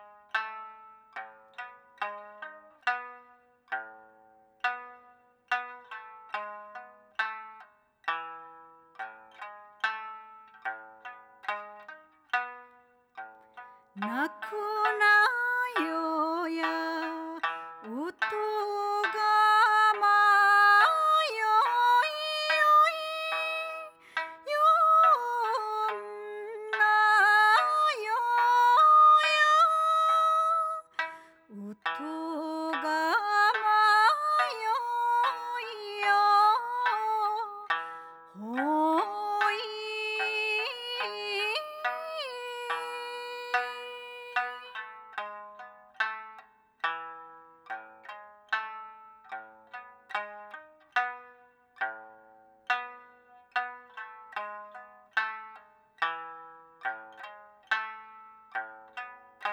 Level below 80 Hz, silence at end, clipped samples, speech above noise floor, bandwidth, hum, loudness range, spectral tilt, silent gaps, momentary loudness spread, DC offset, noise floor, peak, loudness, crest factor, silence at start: -90 dBFS; 0 s; under 0.1%; 35 dB; 18.5 kHz; none; 16 LU; -1.5 dB/octave; none; 24 LU; under 0.1%; -61 dBFS; -10 dBFS; -27 LUFS; 18 dB; 0 s